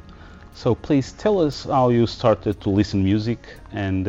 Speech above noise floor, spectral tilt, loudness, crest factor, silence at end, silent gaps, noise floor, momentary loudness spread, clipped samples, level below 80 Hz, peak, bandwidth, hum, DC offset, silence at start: 22 dB; -7.5 dB/octave; -21 LUFS; 16 dB; 0 s; none; -42 dBFS; 9 LU; under 0.1%; -44 dBFS; -4 dBFS; 7.8 kHz; none; under 0.1%; 0.1 s